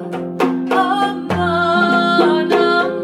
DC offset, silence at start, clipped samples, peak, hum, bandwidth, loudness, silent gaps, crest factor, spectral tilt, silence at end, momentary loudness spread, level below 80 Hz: under 0.1%; 0 s; under 0.1%; -2 dBFS; none; 12.5 kHz; -15 LUFS; none; 14 dB; -6 dB/octave; 0 s; 6 LU; -54 dBFS